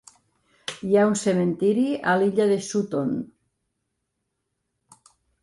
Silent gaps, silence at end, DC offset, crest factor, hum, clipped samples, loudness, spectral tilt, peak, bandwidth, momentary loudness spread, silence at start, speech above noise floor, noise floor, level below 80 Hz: none; 2.15 s; under 0.1%; 16 dB; none; under 0.1%; -23 LUFS; -5.5 dB/octave; -8 dBFS; 11.5 kHz; 13 LU; 0.7 s; 57 dB; -78 dBFS; -66 dBFS